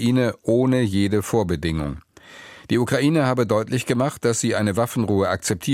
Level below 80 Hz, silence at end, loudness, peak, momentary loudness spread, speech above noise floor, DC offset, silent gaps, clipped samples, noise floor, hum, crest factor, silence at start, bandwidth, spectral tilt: -44 dBFS; 0 s; -21 LUFS; -6 dBFS; 6 LU; 24 dB; under 0.1%; none; under 0.1%; -44 dBFS; none; 16 dB; 0 s; 16 kHz; -5.5 dB/octave